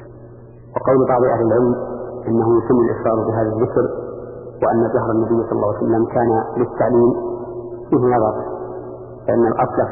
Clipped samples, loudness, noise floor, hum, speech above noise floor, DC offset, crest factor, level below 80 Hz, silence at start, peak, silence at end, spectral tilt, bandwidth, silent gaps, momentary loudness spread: under 0.1%; -18 LUFS; -39 dBFS; none; 23 dB; under 0.1%; 14 dB; -46 dBFS; 0 s; -4 dBFS; 0 s; -15 dB/octave; 2.7 kHz; none; 14 LU